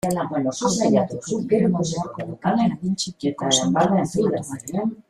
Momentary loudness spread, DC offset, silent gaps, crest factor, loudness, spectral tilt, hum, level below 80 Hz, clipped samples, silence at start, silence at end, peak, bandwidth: 8 LU; under 0.1%; none; 18 dB; -22 LUFS; -5 dB/octave; none; -54 dBFS; under 0.1%; 0.05 s; 0.1 s; -4 dBFS; 14.5 kHz